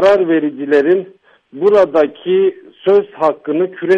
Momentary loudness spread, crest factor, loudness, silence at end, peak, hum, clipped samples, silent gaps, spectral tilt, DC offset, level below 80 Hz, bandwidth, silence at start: 7 LU; 12 dB; -14 LUFS; 0 s; -2 dBFS; none; under 0.1%; none; -7 dB/octave; under 0.1%; -60 dBFS; 7 kHz; 0 s